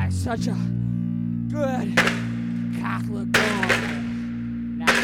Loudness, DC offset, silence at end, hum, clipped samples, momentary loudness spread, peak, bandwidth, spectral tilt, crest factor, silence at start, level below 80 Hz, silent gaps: -24 LUFS; under 0.1%; 0 s; none; under 0.1%; 8 LU; -6 dBFS; 18 kHz; -5 dB/octave; 18 dB; 0 s; -46 dBFS; none